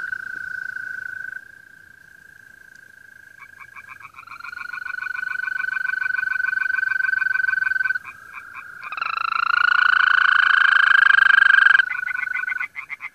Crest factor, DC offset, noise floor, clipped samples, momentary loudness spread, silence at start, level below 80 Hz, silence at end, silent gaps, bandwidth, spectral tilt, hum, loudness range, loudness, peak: 18 dB; under 0.1%; -47 dBFS; under 0.1%; 24 LU; 0 s; -68 dBFS; 0.05 s; none; 14 kHz; 0.5 dB/octave; none; 21 LU; -18 LUFS; -2 dBFS